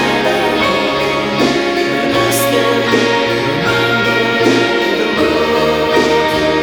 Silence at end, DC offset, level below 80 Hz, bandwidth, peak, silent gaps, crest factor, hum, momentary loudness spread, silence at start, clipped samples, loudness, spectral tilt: 0 s; under 0.1%; -40 dBFS; over 20 kHz; 0 dBFS; none; 12 dB; none; 3 LU; 0 s; under 0.1%; -13 LUFS; -4 dB/octave